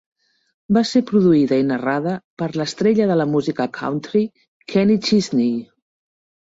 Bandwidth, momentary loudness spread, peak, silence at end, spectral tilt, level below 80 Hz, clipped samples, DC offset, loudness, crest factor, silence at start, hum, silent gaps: 8 kHz; 10 LU; -4 dBFS; 0.85 s; -6.5 dB/octave; -58 dBFS; under 0.1%; under 0.1%; -19 LUFS; 14 dB; 0.7 s; none; 2.24-2.37 s, 4.48-4.60 s